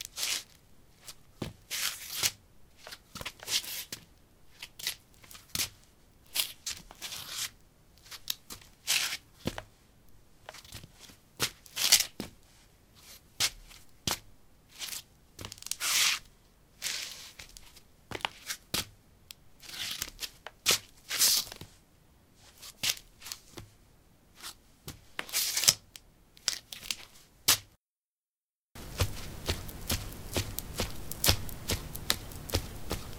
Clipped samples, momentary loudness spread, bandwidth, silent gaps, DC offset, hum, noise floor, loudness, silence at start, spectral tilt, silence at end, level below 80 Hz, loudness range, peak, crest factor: under 0.1%; 24 LU; 18 kHz; 27.92-28.18 s, 28.28-28.69 s; under 0.1%; none; under -90 dBFS; -32 LUFS; 0 s; -1 dB/octave; 0 s; -52 dBFS; 7 LU; -2 dBFS; 34 dB